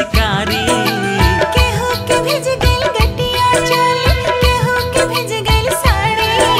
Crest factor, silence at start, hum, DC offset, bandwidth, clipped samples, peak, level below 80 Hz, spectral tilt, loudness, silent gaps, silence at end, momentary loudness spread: 14 dB; 0 s; none; under 0.1%; 16 kHz; under 0.1%; 0 dBFS; -22 dBFS; -4 dB/octave; -14 LUFS; none; 0 s; 3 LU